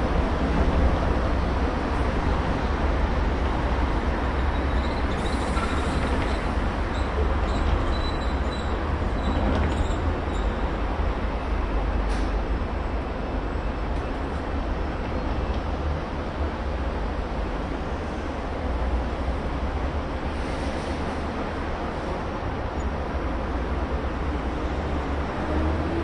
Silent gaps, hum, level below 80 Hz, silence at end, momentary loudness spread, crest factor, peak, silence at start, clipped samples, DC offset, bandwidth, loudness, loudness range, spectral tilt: none; none; -28 dBFS; 0 s; 5 LU; 14 dB; -10 dBFS; 0 s; under 0.1%; under 0.1%; 10.5 kHz; -27 LUFS; 4 LU; -7 dB/octave